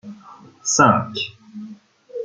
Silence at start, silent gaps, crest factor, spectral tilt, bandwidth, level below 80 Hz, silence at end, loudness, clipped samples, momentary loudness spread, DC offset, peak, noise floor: 0.05 s; none; 20 dB; -3.5 dB/octave; 10 kHz; -60 dBFS; 0 s; -18 LUFS; under 0.1%; 24 LU; under 0.1%; -2 dBFS; -45 dBFS